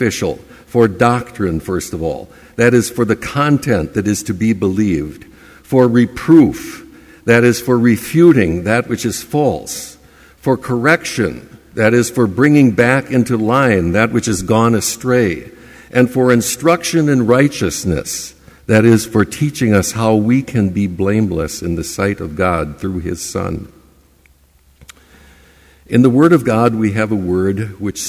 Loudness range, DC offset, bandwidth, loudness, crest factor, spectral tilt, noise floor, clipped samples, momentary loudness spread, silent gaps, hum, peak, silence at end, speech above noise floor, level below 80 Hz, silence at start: 6 LU; under 0.1%; 16 kHz; -14 LUFS; 14 dB; -6 dB/octave; -51 dBFS; under 0.1%; 12 LU; none; none; 0 dBFS; 0 s; 37 dB; -38 dBFS; 0 s